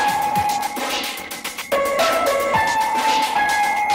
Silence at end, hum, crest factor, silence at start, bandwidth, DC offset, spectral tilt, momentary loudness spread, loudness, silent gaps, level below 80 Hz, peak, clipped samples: 0 s; none; 14 dB; 0 s; 16.5 kHz; under 0.1%; -2 dB/octave; 7 LU; -19 LUFS; none; -52 dBFS; -6 dBFS; under 0.1%